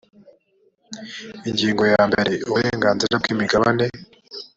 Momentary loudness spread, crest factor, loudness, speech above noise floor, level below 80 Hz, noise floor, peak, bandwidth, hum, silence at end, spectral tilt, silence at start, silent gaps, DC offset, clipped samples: 19 LU; 18 dB; -19 LUFS; 42 dB; -52 dBFS; -62 dBFS; -2 dBFS; 8 kHz; none; 0.1 s; -5 dB/octave; 0.9 s; none; under 0.1%; under 0.1%